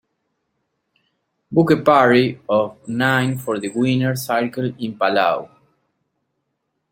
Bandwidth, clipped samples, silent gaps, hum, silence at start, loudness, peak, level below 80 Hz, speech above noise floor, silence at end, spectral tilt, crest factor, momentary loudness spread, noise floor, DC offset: 16.5 kHz; under 0.1%; none; none; 1.5 s; -18 LUFS; -2 dBFS; -62 dBFS; 56 dB; 1.45 s; -6 dB/octave; 18 dB; 11 LU; -74 dBFS; under 0.1%